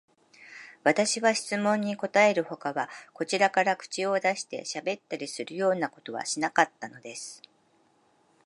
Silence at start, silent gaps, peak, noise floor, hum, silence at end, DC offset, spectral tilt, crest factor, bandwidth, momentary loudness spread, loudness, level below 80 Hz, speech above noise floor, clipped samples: 0.4 s; none; -6 dBFS; -66 dBFS; none; 1.1 s; under 0.1%; -3 dB/octave; 24 dB; 11.5 kHz; 16 LU; -27 LUFS; -82 dBFS; 38 dB; under 0.1%